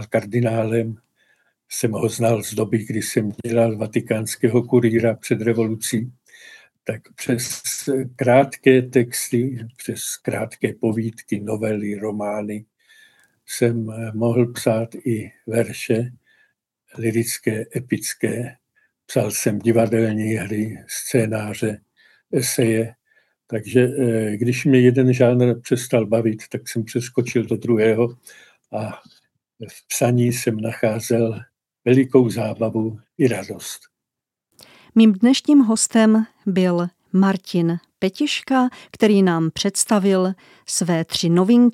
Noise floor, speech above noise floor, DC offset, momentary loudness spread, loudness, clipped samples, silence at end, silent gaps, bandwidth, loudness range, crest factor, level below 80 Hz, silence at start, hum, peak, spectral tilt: -85 dBFS; 66 dB; under 0.1%; 13 LU; -20 LUFS; under 0.1%; 0 s; none; 15 kHz; 6 LU; 18 dB; -66 dBFS; 0 s; none; -2 dBFS; -5.5 dB/octave